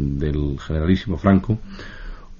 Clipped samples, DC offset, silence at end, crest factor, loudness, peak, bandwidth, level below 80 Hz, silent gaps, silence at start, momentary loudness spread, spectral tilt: under 0.1%; under 0.1%; 0 s; 18 dB; -21 LUFS; -4 dBFS; 7.2 kHz; -30 dBFS; none; 0 s; 20 LU; -7.5 dB/octave